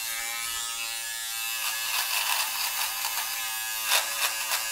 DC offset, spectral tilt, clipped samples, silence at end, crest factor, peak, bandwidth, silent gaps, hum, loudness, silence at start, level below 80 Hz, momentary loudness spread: under 0.1%; 3.5 dB/octave; under 0.1%; 0 s; 22 dB; -8 dBFS; 16.5 kHz; none; none; -27 LUFS; 0 s; -66 dBFS; 6 LU